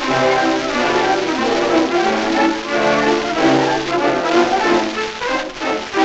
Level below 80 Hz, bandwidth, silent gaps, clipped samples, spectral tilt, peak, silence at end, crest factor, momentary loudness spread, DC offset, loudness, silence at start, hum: -46 dBFS; 8.4 kHz; none; under 0.1%; -4 dB/octave; -2 dBFS; 0 s; 14 dB; 6 LU; under 0.1%; -16 LUFS; 0 s; none